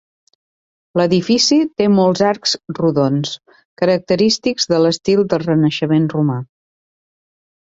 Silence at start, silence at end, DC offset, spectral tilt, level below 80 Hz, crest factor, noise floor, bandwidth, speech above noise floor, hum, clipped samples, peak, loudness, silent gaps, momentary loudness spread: 0.95 s; 1.2 s; under 0.1%; -5.5 dB/octave; -56 dBFS; 14 dB; under -90 dBFS; 7.8 kHz; over 75 dB; none; under 0.1%; -2 dBFS; -16 LUFS; 3.65-3.77 s; 7 LU